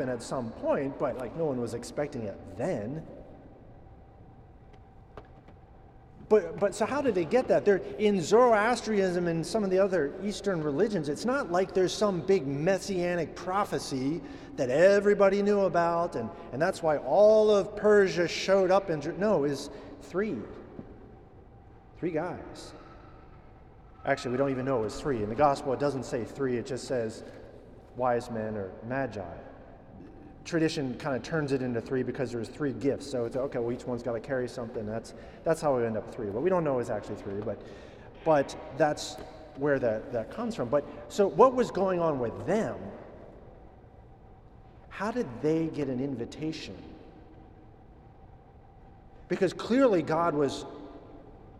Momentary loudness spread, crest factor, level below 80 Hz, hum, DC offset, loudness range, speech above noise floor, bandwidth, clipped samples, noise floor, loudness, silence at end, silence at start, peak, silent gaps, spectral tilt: 19 LU; 22 dB; -56 dBFS; none; under 0.1%; 11 LU; 25 dB; 13 kHz; under 0.1%; -53 dBFS; -29 LUFS; 0 s; 0 s; -8 dBFS; none; -6 dB/octave